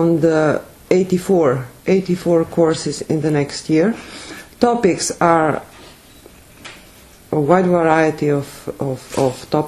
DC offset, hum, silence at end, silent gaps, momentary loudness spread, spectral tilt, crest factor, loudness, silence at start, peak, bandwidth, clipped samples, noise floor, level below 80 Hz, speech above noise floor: under 0.1%; none; 0 s; none; 14 LU; -6 dB/octave; 18 dB; -17 LUFS; 0 s; 0 dBFS; 13.5 kHz; under 0.1%; -44 dBFS; -50 dBFS; 28 dB